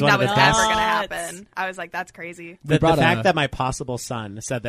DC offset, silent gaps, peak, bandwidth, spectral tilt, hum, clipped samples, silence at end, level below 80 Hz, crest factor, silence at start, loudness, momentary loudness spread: under 0.1%; none; -4 dBFS; 15 kHz; -4 dB/octave; none; under 0.1%; 0 s; -44 dBFS; 18 dB; 0 s; -20 LUFS; 15 LU